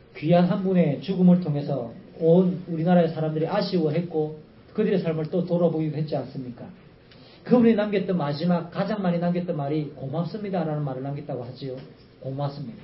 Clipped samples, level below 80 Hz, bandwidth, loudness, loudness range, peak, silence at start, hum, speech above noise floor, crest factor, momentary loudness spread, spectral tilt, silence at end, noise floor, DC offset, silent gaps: under 0.1%; -62 dBFS; 5.8 kHz; -24 LUFS; 6 LU; -4 dBFS; 0.15 s; none; 26 dB; 20 dB; 16 LU; -12.5 dB/octave; 0 s; -50 dBFS; under 0.1%; none